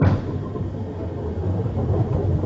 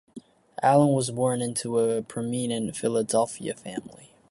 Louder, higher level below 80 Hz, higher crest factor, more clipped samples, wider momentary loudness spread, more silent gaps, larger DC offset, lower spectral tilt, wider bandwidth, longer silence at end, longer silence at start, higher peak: about the same, -25 LUFS vs -25 LUFS; first, -34 dBFS vs -66 dBFS; about the same, 18 dB vs 18 dB; neither; second, 7 LU vs 14 LU; neither; neither; first, -10 dB/octave vs -5.5 dB/octave; second, 5.8 kHz vs 11.5 kHz; second, 0 s vs 0.25 s; second, 0 s vs 0.15 s; about the same, -6 dBFS vs -8 dBFS